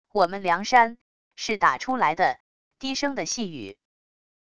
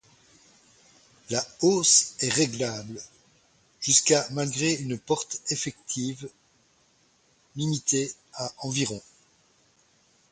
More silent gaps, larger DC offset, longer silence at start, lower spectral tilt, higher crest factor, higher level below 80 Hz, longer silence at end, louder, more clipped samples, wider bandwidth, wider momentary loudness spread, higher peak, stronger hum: first, 1.01-1.31 s, 2.40-2.71 s vs none; first, 0.4% vs under 0.1%; second, 0.15 s vs 1.3 s; about the same, -3 dB/octave vs -3 dB/octave; about the same, 20 dB vs 24 dB; about the same, -62 dBFS vs -66 dBFS; second, 0.75 s vs 1.3 s; about the same, -24 LUFS vs -25 LUFS; neither; about the same, 11 kHz vs 11 kHz; about the same, 15 LU vs 17 LU; about the same, -4 dBFS vs -6 dBFS; neither